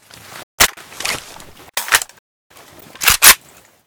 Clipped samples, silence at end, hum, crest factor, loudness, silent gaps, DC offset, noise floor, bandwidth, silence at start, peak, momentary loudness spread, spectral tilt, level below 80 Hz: 0.2%; 0.5 s; none; 18 dB; -13 LUFS; 0.43-0.58 s, 2.19-2.50 s; under 0.1%; -47 dBFS; over 20 kHz; 0.35 s; 0 dBFS; 18 LU; 1 dB/octave; -42 dBFS